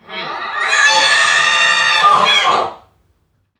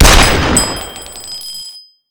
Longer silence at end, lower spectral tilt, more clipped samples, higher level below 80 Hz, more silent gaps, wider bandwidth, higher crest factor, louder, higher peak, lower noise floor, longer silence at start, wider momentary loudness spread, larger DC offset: first, 0.8 s vs 0.3 s; second, 0.5 dB/octave vs -3 dB/octave; second, under 0.1% vs 1%; second, -62 dBFS vs -18 dBFS; neither; second, 13 kHz vs over 20 kHz; about the same, 14 dB vs 12 dB; about the same, -11 LUFS vs -11 LUFS; about the same, 0 dBFS vs 0 dBFS; first, -61 dBFS vs -34 dBFS; about the same, 0.1 s vs 0 s; second, 13 LU vs 18 LU; neither